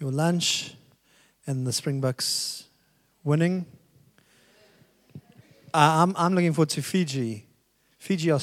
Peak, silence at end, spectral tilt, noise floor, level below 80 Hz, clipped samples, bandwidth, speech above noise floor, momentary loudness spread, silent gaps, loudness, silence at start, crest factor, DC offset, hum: -2 dBFS; 0 s; -5 dB/octave; -66 dBFS; -74 dBFS; under 0.1%; 15.5 kHz; 42 dB; 17 LU; none; -25 LUFS; 0 s; 24 dB; under 0.1%; none